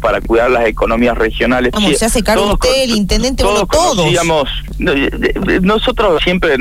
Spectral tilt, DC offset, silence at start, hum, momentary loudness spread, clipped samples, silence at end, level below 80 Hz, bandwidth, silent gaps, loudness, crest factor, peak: -4 dB/octave; 1%; 0 s; none; 3 LU; under 0.1%; 0 s; -22 dBFS; 16.5 kHz; none; -12 LUFS; 10 dB; -2 dBFS